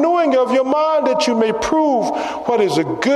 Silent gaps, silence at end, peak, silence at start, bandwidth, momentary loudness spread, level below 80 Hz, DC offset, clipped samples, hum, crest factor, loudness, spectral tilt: none; 0 s; -4 dBFS; 0 s; 13 kHz; 4 LU; -50 dBFS; under 0.1%; under 0.1%; none; 12 dB; -16 LUFS; -4.5 dB/octave